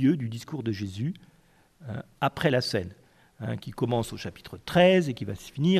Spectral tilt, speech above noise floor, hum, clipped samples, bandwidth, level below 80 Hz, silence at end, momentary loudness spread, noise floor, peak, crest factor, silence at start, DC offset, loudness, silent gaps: -6.5 dB/octave; 33 dB; none; under 0.1%; 14.5 kHz; -56 dBFS; 0 s; 18 LU; -60 dBFS; -8 dBFS; 20 dB; 0 s; under 0.1%; -27 LUFS; none